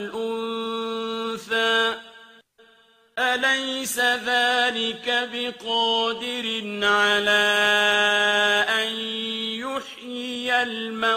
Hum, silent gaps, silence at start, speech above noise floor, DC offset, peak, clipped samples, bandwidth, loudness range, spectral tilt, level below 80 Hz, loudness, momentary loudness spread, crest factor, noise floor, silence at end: none; none; 0 s; 35 dB; under 0.1%; -6 dBFS; under 0.1%; 15.5 kHz; 5 LU; -1.5 dB/octave; -68 dBFS; -22 LUFS; 11 LU; 18 dB; -57 dBFS; 0 s